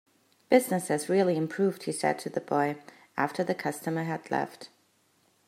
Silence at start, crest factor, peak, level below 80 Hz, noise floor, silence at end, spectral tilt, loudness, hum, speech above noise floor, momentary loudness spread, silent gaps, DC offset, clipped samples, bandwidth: 0.5 s; 22 dB; -8 dBFS; -80 dBFS; -68 dBFS; 0.8 s; -5.5 dB/octave; -29 LUFS; none; 40 dB; 11 LU; none; under 0.1%; under 0.1%; 16 kHz